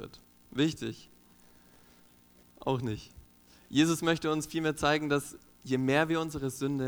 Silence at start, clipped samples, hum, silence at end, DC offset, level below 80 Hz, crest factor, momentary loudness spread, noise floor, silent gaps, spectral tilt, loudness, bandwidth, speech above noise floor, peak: 0 s; under 0.1%; 60 Hz at -65 dBFS; 0 s; under 0.1%; -58 dBFS; 20 dB; 14 LU; -60 dBFS; none; -5 dB/octave; -31 LUFS; 19 kHz; 31 dB; -12 dBFS